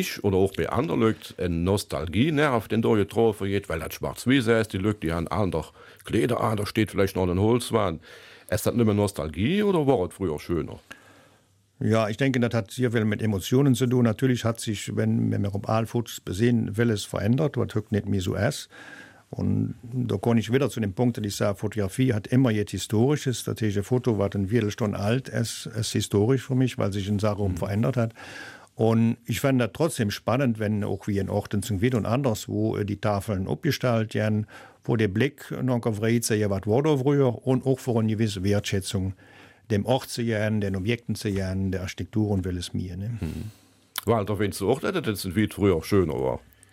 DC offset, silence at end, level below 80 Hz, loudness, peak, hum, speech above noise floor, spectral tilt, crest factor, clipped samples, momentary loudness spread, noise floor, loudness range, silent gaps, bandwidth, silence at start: under 0.1%; 0.35 s; -52 dBFS; -25 LUFS; -8 dBFS; none; 37 dB; -6.5 dB/octave; 18 dB; under 0.1%; 8 LU; -61 dBFS; 3 LU; none; 16 kHz; 0 s